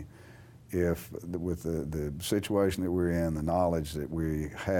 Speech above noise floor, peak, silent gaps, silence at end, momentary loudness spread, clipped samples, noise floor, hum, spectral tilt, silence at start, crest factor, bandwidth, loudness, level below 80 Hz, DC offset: 22 dB; -14 dBFS; none; 0 s; 8 LU; under 0.1%; -52 dBFS; none; -6.5 dB/octave; 0 s; 16 dB; 19 kHz; -31 LUFS; -46 dBFS; under 0.1%